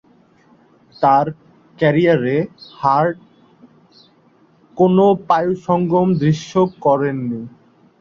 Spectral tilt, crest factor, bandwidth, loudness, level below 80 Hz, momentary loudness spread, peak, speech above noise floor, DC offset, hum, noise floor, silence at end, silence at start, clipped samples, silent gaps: -8 dB/octave; 16 dB; 7.4 kHz; -17 LUFS; -56 dBFS; 12 LU; -2 dBFS; 38 dB; under 0.1%; none; -53 dBFS; 0.5 s; 1 s; under 0.1%; none